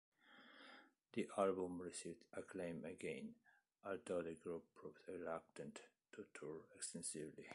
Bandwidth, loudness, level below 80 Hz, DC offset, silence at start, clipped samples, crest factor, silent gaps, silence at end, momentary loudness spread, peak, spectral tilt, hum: 11.5 kHz; -49 LUFS; -80 dBFS; under 0.1%; 0.25 s; under 0.1%; 22 dB; none; 0 s; 18 LU; -28 dBFS; -4.5 dB/octave; none